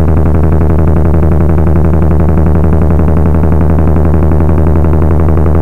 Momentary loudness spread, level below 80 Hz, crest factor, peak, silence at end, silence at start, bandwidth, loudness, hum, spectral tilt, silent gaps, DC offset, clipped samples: 0 LU; -12 dBFS; 8 dB; 0 dBFS; 0 s; 0 s; 2.9 kHz; -9 LUFS; none; -11 dB/octave; none; 20%; under 0.1%